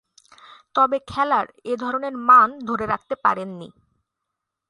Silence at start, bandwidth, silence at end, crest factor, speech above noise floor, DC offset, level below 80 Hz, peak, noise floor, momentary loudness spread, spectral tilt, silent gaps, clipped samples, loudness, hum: 0.75 s; 11 kHz; 1 s; 20 dB; 62 dB; under 0.1%; -58 dBFS; -2 dBFS; -82 dBFS; 14 LU; -5.5 dB/octave; none; under 0.1%; -20 LUFS; none